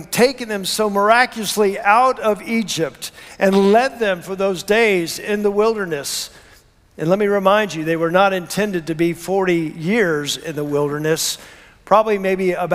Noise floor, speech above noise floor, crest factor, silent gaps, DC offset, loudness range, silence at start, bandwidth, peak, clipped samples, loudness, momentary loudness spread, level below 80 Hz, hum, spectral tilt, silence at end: -50 dBFS; 32 dB; 18 dB; none; under 0.1%; 3 LU; 0 s; 16 kHz; 0 dBFS; under 0.1%; -18 LUFS; 8 LU; -54 dBFS; none; -4 dB/octave; 0 s